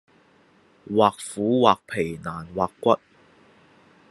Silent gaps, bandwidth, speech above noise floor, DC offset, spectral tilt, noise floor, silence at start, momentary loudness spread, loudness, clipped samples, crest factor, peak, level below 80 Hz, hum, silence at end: none; 12.5 kHz; 36 dB; under 0.1%; -5.5 dB/octave; -58 dBFS; 0.9 s; 10 LU; -23 LUFS; under 0.1%; 22 dB; -2 dBFS; -66 dBFS; none; 1.15 s